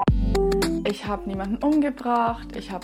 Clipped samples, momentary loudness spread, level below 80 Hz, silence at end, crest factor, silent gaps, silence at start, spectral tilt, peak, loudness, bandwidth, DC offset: under 0.1%; 7 LU; -32 dBFS; 0 s; 14 dB; none; 0 s; -6.5 dB/octave; -10 dBFS; -24 LUFS; 15 kHz; under 0.1%